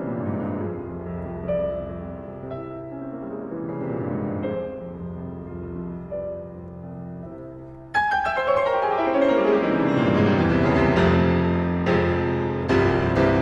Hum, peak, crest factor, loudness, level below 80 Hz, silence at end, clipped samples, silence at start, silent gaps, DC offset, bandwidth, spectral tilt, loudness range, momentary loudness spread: none; -6 dBFS; 16 dB; -23 LUFS; -44 dBFS; 0 s; under 0.1%; 0 s; none; under 0.1%; 8 kHz; -8 dB/octave; 11 LU; 16 LU